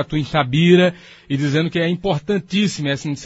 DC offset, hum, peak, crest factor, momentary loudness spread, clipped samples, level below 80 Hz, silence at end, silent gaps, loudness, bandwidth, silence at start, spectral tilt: under 0.1%; none; 0 dBFS; 18 dB; 9 LU; under 0.1%; -48 dBFS; 0 s; none; -18 LUFS; 8 kHz; 0 s; -6 dB/octave